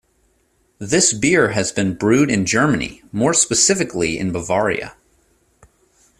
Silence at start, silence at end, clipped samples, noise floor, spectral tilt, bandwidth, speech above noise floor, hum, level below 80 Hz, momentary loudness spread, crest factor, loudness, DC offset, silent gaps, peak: 0.8 s; 1.3 s; under 0.1%; -62 dBFS; -3.5 dB/octave; 14.5 kHz; 44 dB; none; -48 dBFS; 9 LU; 18 dB; -17 LUFS; under 0.1%; none; -2 dBFS